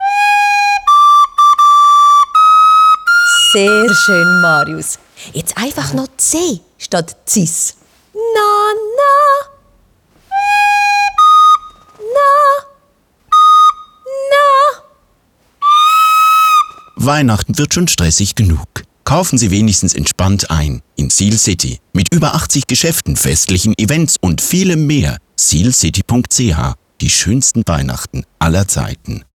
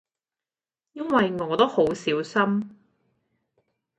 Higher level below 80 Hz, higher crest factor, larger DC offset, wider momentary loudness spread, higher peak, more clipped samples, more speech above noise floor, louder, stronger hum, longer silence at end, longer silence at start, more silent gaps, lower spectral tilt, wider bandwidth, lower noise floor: first, -32 dBFS vs -66 dBFS; second, 10 dB vs 22 dB; neither; first, 12 LU vs 9 LU; first, -2 dBFS vs -6 dBFS; neither; second, 42 dB vs over 67 dB; first, -10 LUFS vs -23 LUFS; neither; second, 0.15 s vs 1.25 s; second, 0 s vs 0.95 s; neither; second, -3.5 dB/octave vs -6 dB/octave; first, over 20 kHz vs 9 kHz; second, -55 dBFS vs under -90 dBFS